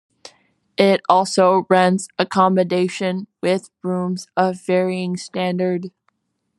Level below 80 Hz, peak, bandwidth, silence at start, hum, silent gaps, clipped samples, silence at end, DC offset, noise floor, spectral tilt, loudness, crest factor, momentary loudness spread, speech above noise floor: -68 dBFS; 0 dBFS; 11.5 kHz; 0.25 s; none; none; under 0.1%; 0.7 s; under 0.1%; -68 dBFS; -5.5 dB/octave; -19 LUFS; 18 dB; 10 LU; 50 dB